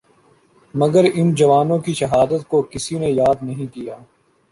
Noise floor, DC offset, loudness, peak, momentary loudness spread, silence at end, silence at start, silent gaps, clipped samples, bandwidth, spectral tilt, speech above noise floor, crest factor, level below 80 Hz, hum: -55 dBFS; under 0.1%; -17 LUFS; -2 dBFS; 14 LU; 0.55 s; 0.75 s; none; under 0.1%; 11.5 kHz; -6.5 dB/octave; 38 dB; 16 dB; -50 dBFS; none